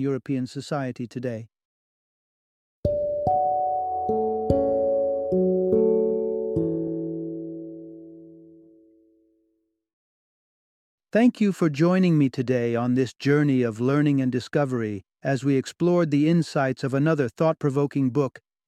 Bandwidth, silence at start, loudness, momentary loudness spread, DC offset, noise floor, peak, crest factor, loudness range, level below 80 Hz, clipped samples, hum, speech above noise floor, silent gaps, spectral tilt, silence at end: 12 kHz; 0 s; -24 LUFS; 11 LU; under 0.1%; -73 dBFS; -6 dBFS; 18 dB; 9 LU; -52 dBFS; under 0.1%; none; 50 dB; 1.65-2.83 s, 9.93-10.98 s; -8 dB/octave; 0.3 s